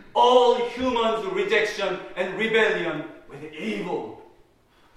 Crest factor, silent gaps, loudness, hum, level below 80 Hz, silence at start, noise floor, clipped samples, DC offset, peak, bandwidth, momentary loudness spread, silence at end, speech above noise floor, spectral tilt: 20 dB; none; -23 LUFS; none; -56 dBFS; 0 s; -59 dBFS; under 0.1%; under 0.1%; -4 dBFS; 11.5 kHz; 16 LU; 0.7 s; 35 dB; -4 dB/octave